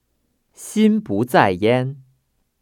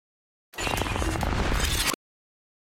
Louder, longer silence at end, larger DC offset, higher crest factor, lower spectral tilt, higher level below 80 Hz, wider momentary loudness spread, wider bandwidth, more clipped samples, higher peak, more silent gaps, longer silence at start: first, -18 LUFS vs -27 LUFS; about the same, 0.65 s vs 0.65 s; neither; about the same, 20 dB vs 18 dB; first, -6 dB/octave vs -3.5 dB/octave; second, -60 dBFS vs -34 dBFS; first, 12 LU vs 9 LU; about the same, 15.5 kHz vs 16.5 kHz; neither; first, 0 dBFS vs -12 dBFS; neither; about the same, 0.6 s vs 0.55 s